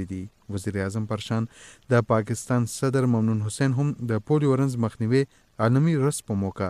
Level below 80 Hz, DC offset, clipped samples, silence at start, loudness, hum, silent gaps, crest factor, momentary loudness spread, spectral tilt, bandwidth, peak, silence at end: -58 dBFS; under 0.1%; under 0.1%; 0 s; -25 LUFS; none; none; 16 dB; 9 LU; -7 dB/octave; 13.5 kHz; -8 dBFS; 0 s